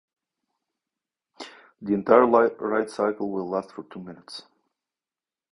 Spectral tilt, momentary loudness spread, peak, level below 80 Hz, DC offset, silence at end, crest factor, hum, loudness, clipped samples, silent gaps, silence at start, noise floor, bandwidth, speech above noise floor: -6.5 dB/octave; 24 LU; -2 dBFS; -68 dBFS; under 0.1%; 1.15 s; 24 dB; none; -23 LUFS; under 0.1%; none; 1.4 s; under -90 dBFS; 11 kHz; over 67 dB